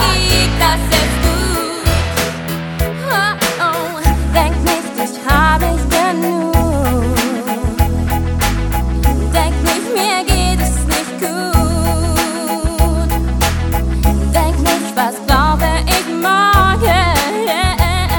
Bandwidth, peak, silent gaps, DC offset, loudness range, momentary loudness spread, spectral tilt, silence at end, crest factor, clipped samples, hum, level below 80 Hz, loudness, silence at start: 17.5 kHz; 0 dBFS; none; under 0.1%; 3 LU; 6 LU; -4.5 dB/octave; 0 s; 14 dB; under 0.1%; none; -18 dBFS; -14 LUFS; 0 s